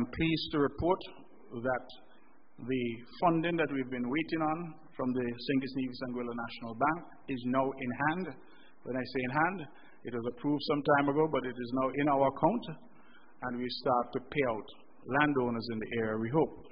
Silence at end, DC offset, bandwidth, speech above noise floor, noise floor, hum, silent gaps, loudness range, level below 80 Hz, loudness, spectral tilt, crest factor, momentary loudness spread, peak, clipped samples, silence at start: 0.05 s; 0.3%; 5.2 kHz; 31 dB; -64 dBFS; none; none; 4 LU; -60 dBFS; -33 LUFS; -4.5 dB/octave; 22 dB; 13 LU; -10 dBFS; under 0.1%; 0 s